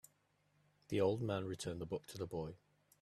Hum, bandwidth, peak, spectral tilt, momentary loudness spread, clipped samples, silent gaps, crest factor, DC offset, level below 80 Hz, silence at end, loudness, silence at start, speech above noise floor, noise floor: 50 Hz at -60 dBFS; 14.5 kHz; -24 dBFS; -6 dB/octave; 9 LU; under 0.1%; none; 20 dB; under 0.1%; -70 dBFS; 0.45 s; -42 LUFS; 0.9 s; 37 dB; -77 dBFS